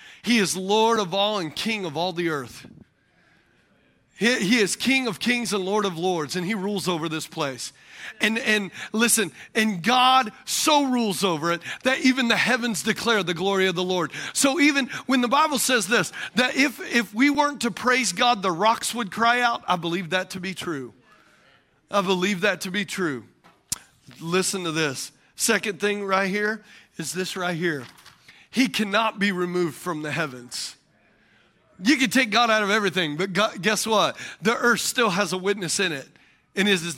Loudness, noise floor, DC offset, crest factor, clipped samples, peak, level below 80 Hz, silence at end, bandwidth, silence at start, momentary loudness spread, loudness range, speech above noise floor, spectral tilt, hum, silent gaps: -23 LUFS; -62 dBFS; under 0.1%; 20 dB; under 0.1%; -4 dBFS; -66 dBFS; 0 s; 16.5 kHz; 0 s; 11 LU; 5 LU; 39 dB; -3 dB/octave; none; none